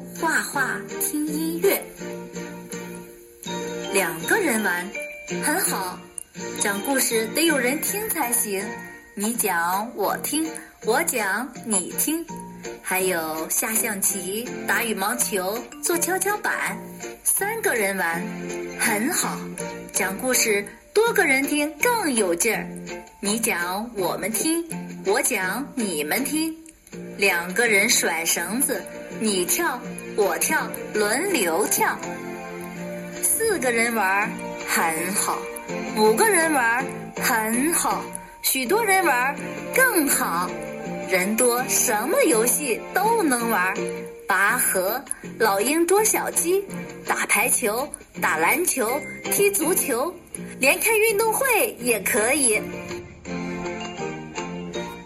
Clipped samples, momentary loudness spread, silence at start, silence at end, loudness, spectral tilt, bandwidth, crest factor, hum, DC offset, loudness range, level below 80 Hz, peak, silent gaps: under 0.1%; 14 LU; 0 s; 0 s; -22 LUFS; -2.5 dB/octave; 16 kHz; 18 dB; none; under 0.1%; 4 LU; -58 dBFS; -6 dBFS; none